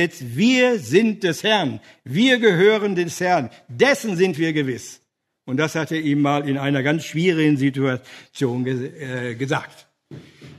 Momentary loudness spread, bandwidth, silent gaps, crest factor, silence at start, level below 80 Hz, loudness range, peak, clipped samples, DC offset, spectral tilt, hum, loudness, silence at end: 12 LU; 13.5 kHz; none; 18 dB; 0 s; -66 dBFS; 4 LU; -2 dBFS; under 0.1%; under 0.1%; -5.5 dB/octave; none; -20 LUFS; 0.05 s